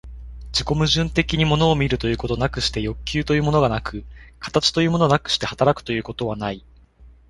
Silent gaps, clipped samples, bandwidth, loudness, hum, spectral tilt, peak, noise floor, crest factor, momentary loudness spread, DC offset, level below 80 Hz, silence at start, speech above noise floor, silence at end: none; under 0.1%; 11.5 kHz; -21 LUFS; none; -5 dB/octave; -2 dBFS; -48 dBFS; 20 dB; 11 LU; under 0.1%; -36 dBFS; 0.05 s; 28 dB; 0.2 s